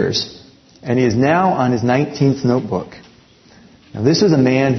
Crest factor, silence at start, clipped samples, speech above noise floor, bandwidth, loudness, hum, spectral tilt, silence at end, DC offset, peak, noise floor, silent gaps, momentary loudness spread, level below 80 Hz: 16 dB; 0 s; under 0.1%; 32 dB; 6.4 kHz; -16 LUFS; none; -6 dB/octave; 0 s; under 0.1%; 0 dBFS; -47 dBFS; none; 14 LU; -52 dBFS